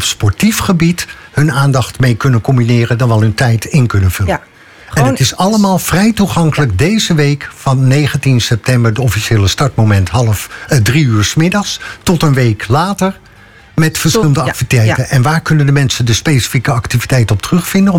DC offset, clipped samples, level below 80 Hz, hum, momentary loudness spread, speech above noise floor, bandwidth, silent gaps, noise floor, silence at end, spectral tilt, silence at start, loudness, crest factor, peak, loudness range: under 0.1%; under 0.1%; -34 dBFS; none; 4 LU; 26 dB; 17 kHz; none; -37 dBFS; 0 s; -5.5 dB/octave; 0 s; -11 LUFS; 10 dB; 0 dBFS; 1 LU